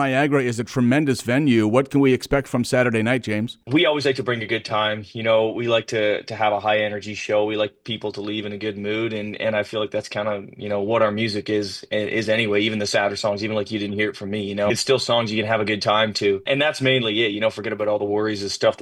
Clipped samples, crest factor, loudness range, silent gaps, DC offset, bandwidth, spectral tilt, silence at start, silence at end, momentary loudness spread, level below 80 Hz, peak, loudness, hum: under 0.1%; 16 dB; 4 LU; none; under 0.1%; 16 kHz; -5 dB/octave; 0 s; 0 s; 7 LU; -54 dBFS; -4 dBFS; -21 LUFS; none